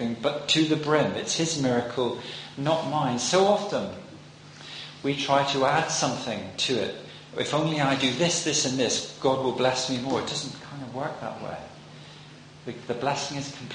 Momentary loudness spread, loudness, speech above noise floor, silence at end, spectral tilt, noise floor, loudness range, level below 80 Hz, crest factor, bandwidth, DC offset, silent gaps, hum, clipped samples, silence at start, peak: 17 LU; -26 LUFS; 21 dB; 0 s; -3.5 dB/octave; -47 dBFS; 6 LU; -62 dBFS; 20 dB; 10 kHz; under 0.1%; none; none; under 0.1%; 0 s; -6 dBFS